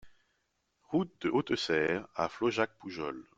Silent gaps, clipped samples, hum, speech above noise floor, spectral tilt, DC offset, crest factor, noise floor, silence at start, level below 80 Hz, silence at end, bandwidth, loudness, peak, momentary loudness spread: none; under 0.1%; none; 46 dB; -5.5 dB/octave; under 0.1%; 20 dB; -79 dBFS; 0.05 s; -68 dBFS; 0.15 s; 8 kHz; -33 LUFS; -14 dBFS; 8 LU